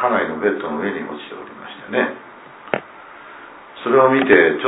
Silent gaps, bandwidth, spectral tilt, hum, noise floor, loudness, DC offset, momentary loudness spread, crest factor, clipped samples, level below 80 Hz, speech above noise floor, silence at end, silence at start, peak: none; 4 kHz; -9.5 dB/octave; none; -40 dBFS; -18 LUFS; under 0.1%; 25 LU; 18 dB; under 0.1%; -60 dBFS; 23 dB; 0 s; 0 s; 0 dBFS